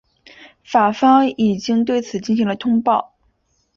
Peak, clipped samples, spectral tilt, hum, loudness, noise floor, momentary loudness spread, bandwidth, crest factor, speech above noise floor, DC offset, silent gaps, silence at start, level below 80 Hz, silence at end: -2 dBFS; under 0.1%; -6 dB/octave; none; -17 LUFS; -64 dBFS; 7 LU; 7.2 kHz; 16 dB; 48 dB; under 0.1%; none; 0.7 s; -58 dBFS; 0.75 s